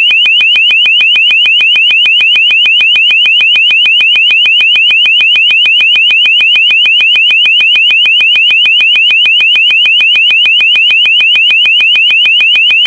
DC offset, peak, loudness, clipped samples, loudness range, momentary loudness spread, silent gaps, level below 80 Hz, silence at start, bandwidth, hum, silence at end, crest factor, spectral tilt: under 0.1%; 0 dBFS; -3 LUFS; under 0.1%; 0 LU; 0 LU; none; -56 dBFS; 0 s; 11.5 kHz; none; 0 s; 6 dB; 2 dB/octave